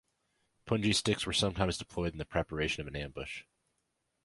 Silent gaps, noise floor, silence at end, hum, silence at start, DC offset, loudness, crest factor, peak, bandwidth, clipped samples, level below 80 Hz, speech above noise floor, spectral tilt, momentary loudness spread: none; -81 dBFS; 0.85 s; none; 0.65 s; under 0.1%; -33 LUFS; 22 dB; -14 dBFS; 11.5 kHz; under 0.1%; -50 dBFS; 48 dB; -4 dB/octave; 11 LU